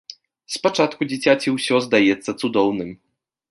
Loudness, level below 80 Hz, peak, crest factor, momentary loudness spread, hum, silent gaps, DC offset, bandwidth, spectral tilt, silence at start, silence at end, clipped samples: -19 LUFS; -62 dBFS; -2 dBFS; 18 dB; 12 LU; none; none; under 0.1%; 11.5 kHz; -4.5 dB/octave; 0.1 s; 0.55 s; under 0.1%